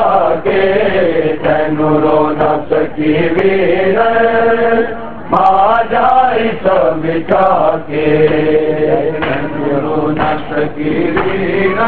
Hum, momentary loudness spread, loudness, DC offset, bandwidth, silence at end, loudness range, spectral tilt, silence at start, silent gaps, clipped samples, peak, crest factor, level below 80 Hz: none; 6 LU; -12 LUFS; 6%; 4.7 kHz; 0 s; 3 LU; -9 dB/octave; 0 s; none; under 0.1%; 0 dBFS; 12 dB; -38 dBFS